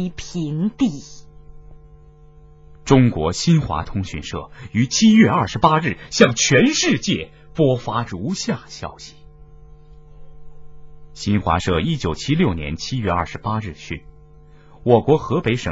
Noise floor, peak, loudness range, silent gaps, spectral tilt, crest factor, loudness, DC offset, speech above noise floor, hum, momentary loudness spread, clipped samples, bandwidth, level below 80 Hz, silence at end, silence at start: -45 dBFS; 0 dBFS; 9 LU; none; -5 dB/octave; 20 dB; -19 LUFS; under 0.1%; 27 dB; none; 17 LU; under 0.1%; 8 kHz; -40 dBFS; 0 s; 0 s